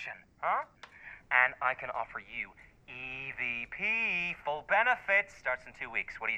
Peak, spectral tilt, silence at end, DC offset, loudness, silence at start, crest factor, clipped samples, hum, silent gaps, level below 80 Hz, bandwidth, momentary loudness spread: -10 dBFS; -3.5 dB/octave; 0 s; under 0.1%; -31 LUFS; 0 s; 24 dB; under 0.1%; none; none; -64 dBFS; 9.6 kHz; 16 LU